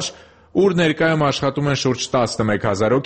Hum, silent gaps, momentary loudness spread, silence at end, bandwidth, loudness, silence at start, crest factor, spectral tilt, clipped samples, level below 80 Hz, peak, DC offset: none; none; 4 LU; 0 s; 8.8 kHz; -19 LUFS; 0 s; 14 dB; -5 dB/octave; under 0.1%; -48 dBFS; -4 dBFS; under 0.1%